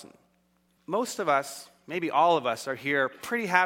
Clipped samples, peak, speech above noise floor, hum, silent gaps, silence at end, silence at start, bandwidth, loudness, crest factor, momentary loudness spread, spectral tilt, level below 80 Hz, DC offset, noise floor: under 0.1%; -6 dBFS; 42 dB; none; none; 0 s; 0 s; 17 kHz; -27 LUFS; 22 dB; 11 LU; -3.5 dB/octave; -76 dBFS; under 0.1%; -68 dBFS